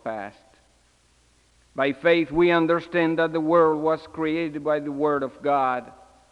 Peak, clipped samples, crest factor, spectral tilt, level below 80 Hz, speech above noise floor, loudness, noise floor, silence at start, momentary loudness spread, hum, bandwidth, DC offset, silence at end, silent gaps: -6 dBFS; under 0.1%; 18 dB; -7 dB/octave; -58 dBFS; 38 dB; -23 LUFS; -61 dBFS; 0.05 s; 10 LU; 60 Hz at -70 dBFS; 9.2 kHz; under 0.1%; 0.4 s; none